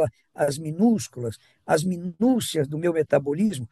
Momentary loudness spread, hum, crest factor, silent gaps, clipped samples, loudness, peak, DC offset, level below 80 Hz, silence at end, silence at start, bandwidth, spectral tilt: 9 LU; none; 18 dB; none; under 0.1%; -24 LUFS; -6 dBFS; under 0.1%; -64 dBFS; 0.05 s; 0 s; 12.5 kHz; -6 dB/octave